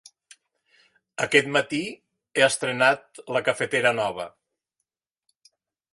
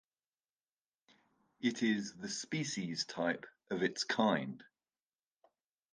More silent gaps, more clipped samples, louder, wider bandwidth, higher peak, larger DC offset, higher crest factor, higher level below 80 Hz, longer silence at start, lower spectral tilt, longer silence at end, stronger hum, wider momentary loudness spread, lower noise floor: neither; neither; first, -23 LUFS vs -37 LUFS; first, 11.5 kHz vs 10 kHz; first, -4 dBFS vs -18 dBFS; neither; about the same, 22 dB vs 22 dB; first, -68 dBFS vs -80 dBFS; second, 1.2 s vs 1.6 s; about the same, -3 dB/octave vs -4 dB/octave; first, 1.65 s vs 1.3 s; neither; first, 13 LU vs 10 LU; second, -83 dBFS vs under -90 dBFS